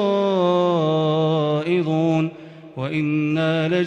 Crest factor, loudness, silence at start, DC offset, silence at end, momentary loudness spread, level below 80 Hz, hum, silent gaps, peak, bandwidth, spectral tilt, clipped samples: 10 dB; -20 LUFS; 0 s; under 0.1%; 0 s; 9 LU; -64 dBFS; none; none; -8 dBFS; 7.8 kHz; -8 dB/octave; under 0.1%